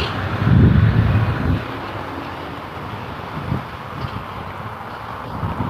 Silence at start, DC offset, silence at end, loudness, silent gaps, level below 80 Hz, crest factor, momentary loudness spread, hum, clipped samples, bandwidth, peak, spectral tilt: 0 s; under 0.1%; 0 s; -21 LUFS; none; -30 dBFS; 18 dB; 16 LU; none; under 0.1%; 6.6 kHz; -2 dBFS; -8.5 dB/octave